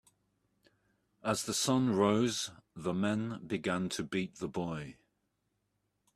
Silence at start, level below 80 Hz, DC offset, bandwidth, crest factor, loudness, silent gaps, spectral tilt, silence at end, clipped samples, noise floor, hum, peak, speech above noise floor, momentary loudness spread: 1.25 s; -68 dBFS; under 0.1%; 14.5 kHz; 22 dB; -34 LUFS; none; -4.5 dB/octave; 1.25 s; under 0.1%; -81 dBFS; 50 Hz at -60 dBFS; -14 dBFS; 48 dB; 12 LU